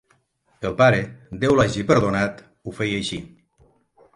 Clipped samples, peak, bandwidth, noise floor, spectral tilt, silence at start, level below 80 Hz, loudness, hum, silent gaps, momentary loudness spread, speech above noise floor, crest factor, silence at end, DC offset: under 0.1%; -4 dBFS; 11.5 kHz; -64 dBFS; -6 dB/octave; 0.6 s; -48 dBFS; -21 LUFS; none; none; 17 LU; 43 dB; 20 dB; 0.9 s; under 0.1%